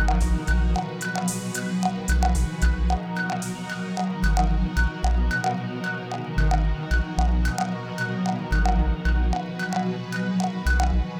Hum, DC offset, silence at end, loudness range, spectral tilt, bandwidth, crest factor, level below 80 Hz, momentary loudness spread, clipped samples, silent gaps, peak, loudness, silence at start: none; under 0.1%; 0 s; 1 LU; -5.5 dB/octave; 14 kHz; 16 dB; -24 dBFS; 6 LU; under 0.1%; none; -8 dBFS; -25 LUFS; 0 s